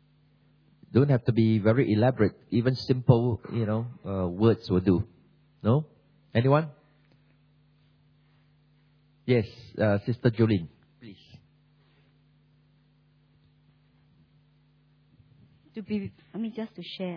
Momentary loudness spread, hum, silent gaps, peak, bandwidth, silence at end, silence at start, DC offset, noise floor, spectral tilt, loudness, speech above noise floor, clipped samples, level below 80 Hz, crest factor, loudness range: 15 LU; none; none; -4 dBFS; 5.4 kHz; 0 s; 0.9 s; under 0.1%; -63 dBFS; -9.5 dB/octave; -26 LUFS; 38 dB; under 0.1%; -58 dBFS; 24 dB; 14 LU